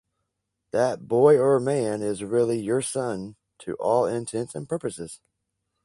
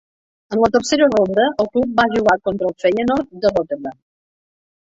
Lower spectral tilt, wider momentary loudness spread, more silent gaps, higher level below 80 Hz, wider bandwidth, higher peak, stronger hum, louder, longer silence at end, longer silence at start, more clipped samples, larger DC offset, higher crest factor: about the same, -6 dB/octave vs -5 dB/octave; first, 17 LU vs 8 LU; neither; second, -64 dBFS vs -50 dBFS; first, 11.5 kHz vs 8 kHz; second, -6 dBFS vs -2 dBFS; neither; second, -24 LUFS vs -17 LUFS; second, 0.7 s vs 0.95 s; first, 0.75 s vs 0.5 s; neither; neither; about the same, 18 dB vs 16 dB